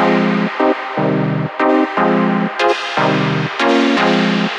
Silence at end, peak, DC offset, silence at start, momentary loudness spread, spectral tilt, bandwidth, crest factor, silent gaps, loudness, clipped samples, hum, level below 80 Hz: 0 s; -2 dBFS; under 0.1%; 0 s; 4 LU; -6 dB/octave; 9.6 kHz; 12 dB; none; -15 LUFS; under 0.1%; none; -60 dBFS